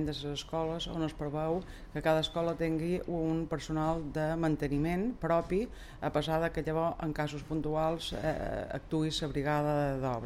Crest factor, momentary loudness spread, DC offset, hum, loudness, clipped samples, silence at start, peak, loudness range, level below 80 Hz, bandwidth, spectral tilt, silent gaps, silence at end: 16 dB; 6 LU; under 0.1%; none; -33 LUFS; under 0.1%; 0 s; -16 dBFS; 1 LU; -48 dBFS; 15 kHz; -6.5 dB/octave; none; 0 s